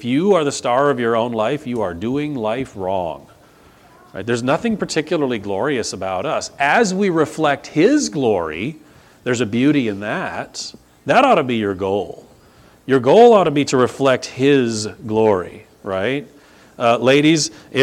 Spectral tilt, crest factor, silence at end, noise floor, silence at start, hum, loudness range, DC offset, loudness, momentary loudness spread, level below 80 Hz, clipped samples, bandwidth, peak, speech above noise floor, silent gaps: -5 dB/octave; 18 dB; 0 s; -48 dBFS; 0 s; none; 7 LU; under 0.1%; -17 LUFS; 13 LU; -56 dBFS; under 0.1%; 13.5 kHz; 0 dBFS; 31 dB; none